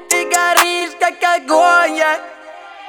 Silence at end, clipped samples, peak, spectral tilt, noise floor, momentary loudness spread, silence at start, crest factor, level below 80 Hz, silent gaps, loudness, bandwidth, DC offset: 0 s; under 0.1%; 0 dBFS; 0.5 dB/octave; -35 dBFS; 7 LU; 0 s; 16 dB; -68 dBFS; none; -13 LUFS; over 20 kHz; under 0.1%